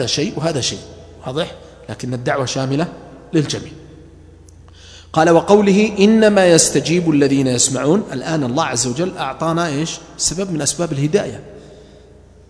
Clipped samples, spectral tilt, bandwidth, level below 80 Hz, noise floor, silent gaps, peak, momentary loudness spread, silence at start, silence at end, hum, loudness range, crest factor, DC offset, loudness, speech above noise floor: under 0.1%; -4.5 dB/octave; 11 kHz; -46 dBFS; -44 dBFS; none; 0 dBFS; 15 LU; 0 s; 0.7 s; none; 9 LU; 18 dB; under 0.1%; -16 LUFS; 28 dB